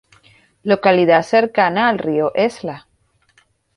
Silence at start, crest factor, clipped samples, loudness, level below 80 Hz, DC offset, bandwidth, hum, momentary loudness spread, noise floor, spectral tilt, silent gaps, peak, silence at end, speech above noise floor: 0.65 s; 16 dB; under 0.1%; -15 LUFS; -60 dBFS; under 0.1%; 11.5 kHz; none; 16 LU; -59 dBFS; -6 dB/octave; none; -2 dBFS; 0.95 s; 44 dB